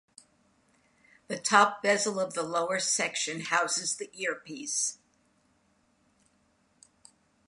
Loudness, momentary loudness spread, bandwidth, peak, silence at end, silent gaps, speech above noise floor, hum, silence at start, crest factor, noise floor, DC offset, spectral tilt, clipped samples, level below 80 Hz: -28 LUFS; 11 LU; 11.5 kHz; -6 dBFS; 2.55 s; none; 40 dB; none; 1.3 s; 26 dB; -69 dBFS; under 0.1%; -1.5 dB/octave; under 0.1%; -80 dBFS